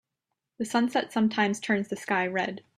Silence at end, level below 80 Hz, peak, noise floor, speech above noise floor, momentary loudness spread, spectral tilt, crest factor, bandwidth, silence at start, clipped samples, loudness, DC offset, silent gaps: 0.2 s; -72 dBFS; -10 dBFS; -85 dBFS; 57 dB; 4 LU; -4.5 dB/octave; 18 dB; 13.5 kHz; 0.6 s; under 0.1%; -27 LUFS; under 0.1%; none